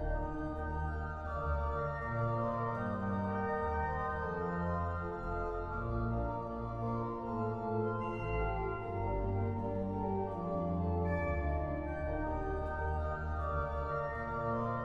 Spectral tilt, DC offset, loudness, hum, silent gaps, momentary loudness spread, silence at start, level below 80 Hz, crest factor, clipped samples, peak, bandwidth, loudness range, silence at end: -9.5 dB/octave; under 0.1%; -37 LUFS; none; none; 4 LU; 0 s; -44 dBFS; 14 dB; under 0.1%; -22 dBFS; 6.2 kHz; 2 LU; 0 s